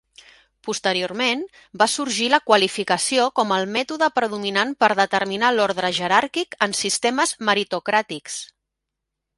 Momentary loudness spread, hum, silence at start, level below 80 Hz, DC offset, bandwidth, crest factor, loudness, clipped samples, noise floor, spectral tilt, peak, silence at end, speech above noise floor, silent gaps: 9 LU; none; 0.65 s; -66 dBFS; under 0.1%; 11.5 kHz; 20 dB; -20 LUFS; under 0.1%; -82 dBFS; -2 dB/octave; 0 dBFS; 0.9 s; 61 dB; none